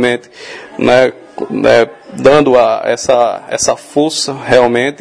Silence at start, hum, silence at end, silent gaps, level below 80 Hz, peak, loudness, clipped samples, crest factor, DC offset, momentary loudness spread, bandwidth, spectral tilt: 0 s; none; 0.05 s; none; -46 dBFS; 0 dBFS; -11 LUFS; 0.8%; 12 dB; under 0.1%; 12 LU; 11 kHz; -4 dB/octave